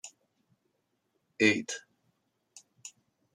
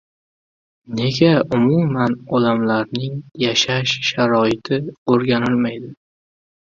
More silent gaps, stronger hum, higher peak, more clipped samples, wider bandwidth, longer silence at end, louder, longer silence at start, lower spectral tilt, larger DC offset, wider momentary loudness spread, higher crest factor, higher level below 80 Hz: second, none vs 4.98-5.06 s; neither; second, -12 dBFS vs -2 dBFS; neither; first, 12 kHz vs 7.6 kHz; second, 0.45 s vs 0.7 s; second, -29 LUFS vs -18 LUFS; second, 0.05 s vs 0.9 s; second, -3.5 dB/octave vs -5.5 dB/octave; neither; first, 23 LU vs 9 LU; first, 24 dB vs 18 dB; second, -82 dBFS vs -54 dBFS